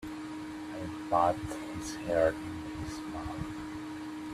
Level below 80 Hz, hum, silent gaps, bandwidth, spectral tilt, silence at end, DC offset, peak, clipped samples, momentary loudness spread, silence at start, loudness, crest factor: -54 dBFS; none; none; 14.5 kHz; -5.5 dB/octave; 0 s; under 0.1%; -14 dBFS; under 0.1%; 12 LU; 0 s; -35 LUFS; 20 dB